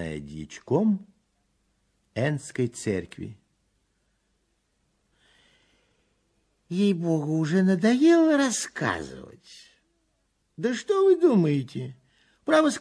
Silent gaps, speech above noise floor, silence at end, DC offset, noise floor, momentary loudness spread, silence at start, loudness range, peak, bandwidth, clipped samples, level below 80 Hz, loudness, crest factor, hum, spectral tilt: none; 49 dB; 0 s; under 0.1%; -72 dBFS; 20 LU; 0 s; 10 LU; -8 dBFS; 11 kHz; under 0.1%; -62 dBFS; -24 LUFS; 18 dB; none; -6 dB/octave